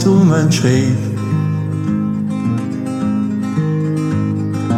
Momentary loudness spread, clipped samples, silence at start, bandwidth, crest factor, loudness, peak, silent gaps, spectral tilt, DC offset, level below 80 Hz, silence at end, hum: 7 LU; under 0.1%; 0 s; 13.5 kHz; 14 dB; -16 LUFS; -2 dBFS; none; -7 dB/octave; under 0.1%; -52 dBFS; 0 s; none